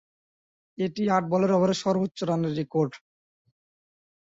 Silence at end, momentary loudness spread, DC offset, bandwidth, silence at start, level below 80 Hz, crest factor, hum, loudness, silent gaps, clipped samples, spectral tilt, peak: 1.25 s; 7 LU; under 0.1%; 8 kHz; 0.8 s; -68 dBFS; 18 dB; none; -26 LUFS; none; under 0.1%; -6.5 dB/octave; -10 dBFS